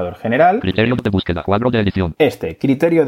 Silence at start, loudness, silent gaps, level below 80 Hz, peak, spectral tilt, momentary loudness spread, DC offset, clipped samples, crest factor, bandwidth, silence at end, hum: 0 s; -16 LUFS; none; -40 dBFS; 0 dBFS; -7.5 dB/octave; 6 LU; under 0.1%; under 0.1%; 14 dB; 16 kHz; 0 s; none